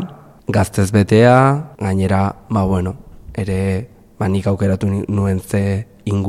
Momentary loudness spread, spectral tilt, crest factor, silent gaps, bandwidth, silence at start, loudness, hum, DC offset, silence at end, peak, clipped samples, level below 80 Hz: 14 LU; -7.5 dB/octave; 16 dB; none; 14 kHz; 0 s; -17 LUFS; none; under 0.1%; 0 s; 0 dBFS; under 0.1%; -42 dBFS